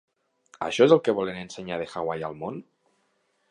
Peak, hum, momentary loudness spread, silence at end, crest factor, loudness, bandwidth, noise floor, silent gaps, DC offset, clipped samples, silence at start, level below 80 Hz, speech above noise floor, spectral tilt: -4 dBFS; none; 17 LU; 0.9 s; 22 dB; -25 LUFS; 10 kHz; -71 dBFS; none; under 0.1%; under 0.1%; 0.6 s; -66 dBFS; 46 dB; -5.5 dB/octave